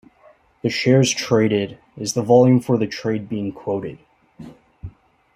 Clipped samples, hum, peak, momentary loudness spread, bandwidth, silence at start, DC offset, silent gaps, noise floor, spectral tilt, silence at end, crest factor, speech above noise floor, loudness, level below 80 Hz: under 0.1%; none; -2 dBFS; 21 LU; 15.5 kHz; 0.65 s; under 0.1%; none; -53 dBFS; -5.5 dB/octave; 0.45 s; 18 dB; 35 dB; -19 LUFS; -56 dBFS